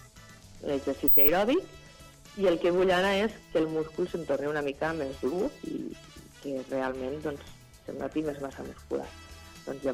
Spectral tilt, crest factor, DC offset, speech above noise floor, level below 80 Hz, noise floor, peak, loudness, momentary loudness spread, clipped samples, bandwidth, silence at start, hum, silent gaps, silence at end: -5.5 dB/octave; 18 dB; under 0.1%; 23 dB; -54 dBFS; -51 dBFS; -10 dBFS; -28 LUFS; 21 LU; under 0.1%; 16 kHz; 0 s; none; none; 0 s